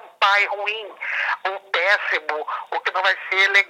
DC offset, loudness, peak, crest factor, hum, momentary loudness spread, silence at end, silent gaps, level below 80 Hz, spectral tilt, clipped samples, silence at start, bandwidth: under 0.1%; -20 LUFS; -2 dBFS; 20 dB; none; 10 LU; 0 s; none; under -90 dBFS; 1 dB/octave; under 0.1%; 0.05 s; 15.5 kHz